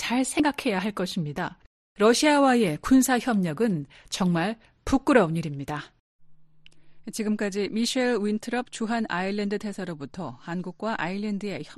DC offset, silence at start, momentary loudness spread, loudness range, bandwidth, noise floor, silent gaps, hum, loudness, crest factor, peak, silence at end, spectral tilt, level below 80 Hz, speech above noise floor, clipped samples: under 0.1%; 0 s; 14 LU; 6 LU; 13 kHz; -50 dBFS; 1.66-1.95 s, 6.00-6.19 s; none; -25 LUFS; 20 dB; -6 dBFS; 0.05 s; -5 dB/octave; -52 dBFS; 25 dB; under 0.1%